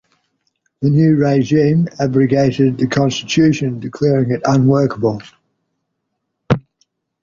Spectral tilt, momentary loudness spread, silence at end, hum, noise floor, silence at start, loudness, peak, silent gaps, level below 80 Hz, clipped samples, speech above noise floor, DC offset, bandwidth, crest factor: -7 dB/octave; 7 LU; 0.65 s; none; -73 dBFS; 0.8 s; -15 LUFS; -2 dBFS; none; -48 dBFS; under 0.1%; 59 dB; under 0.1%; 7.4 kHz; 14 dB